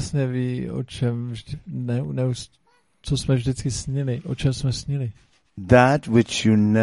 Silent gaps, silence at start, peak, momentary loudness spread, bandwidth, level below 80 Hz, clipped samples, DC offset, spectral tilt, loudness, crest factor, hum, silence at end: none; 0 s; -2 dBFS; 15 LU; 11.5 kHz; -44 dBFS; under 0.1%; under 0.1%; -6 dB/octave; -23 LUFS; 20 dB; none; 0 s